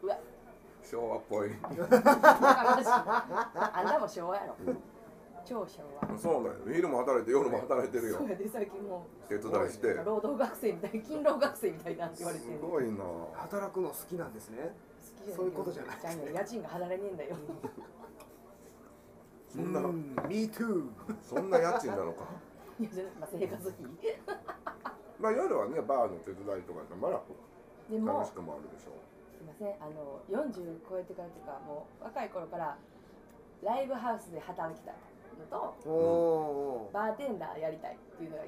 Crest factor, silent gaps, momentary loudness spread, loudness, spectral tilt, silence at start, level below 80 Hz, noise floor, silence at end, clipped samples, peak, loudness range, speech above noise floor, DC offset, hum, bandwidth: 30 dB; none; 17 LU; -33 LUFS; -5.5 dB/octave; 0 s; -68 dBFS; -56 dBFS; 0 s; under 0.1%; -4 dBFS; 14 LU; 23 dB; under 0.1%; none; 15.5 kHz